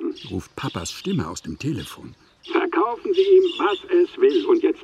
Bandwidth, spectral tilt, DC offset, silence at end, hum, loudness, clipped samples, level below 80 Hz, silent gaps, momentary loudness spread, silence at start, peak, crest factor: 12.5 kHz; -5.5 dB/octave; under 0.1%; 0 s; none; -21 LUFS; under 0.1%; -54 dBFS; none; 15 LU; 0 s; -6 dBFS; 14 dB